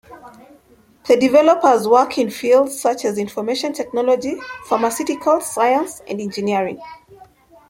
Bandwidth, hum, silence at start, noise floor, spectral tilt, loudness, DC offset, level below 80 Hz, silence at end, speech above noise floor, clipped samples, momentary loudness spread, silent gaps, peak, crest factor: 16.5 kHz; none; 0.1 s; -52 dBFS; -4 dB/octave; -17 LUFS; under 0.1%; -60 dBFS; 0.45 s; 35 dB; under 0.1%; 13 LU; none; -2 dBFS; 16 dB